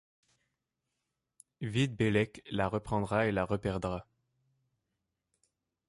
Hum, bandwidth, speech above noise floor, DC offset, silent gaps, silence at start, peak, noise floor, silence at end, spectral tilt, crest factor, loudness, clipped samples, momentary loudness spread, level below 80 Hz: none; 11.5 kHz; 54 dB; under 0.1%; none; 1.6 s; -16 dBFS; -86 dBFS; 1.85 s; -6.5 dB/octave; 20 dB; -33 LUFS; under 0.1%; 8 LU; -56 dBFS